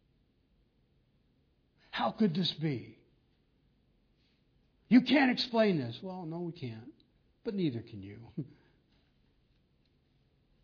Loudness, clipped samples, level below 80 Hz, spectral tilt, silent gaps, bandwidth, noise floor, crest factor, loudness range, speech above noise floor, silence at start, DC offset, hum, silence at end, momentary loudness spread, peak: -31 LUFS; under 0.1%; -72 dBFS; -4.5 dB/octave; none; 5.4 kHz; -72 dBFS; 22 dB; 11 LU; 40 dB; 1.95 s; under 0.1%; none; 2.15 s; 18 LU; -12 dBFS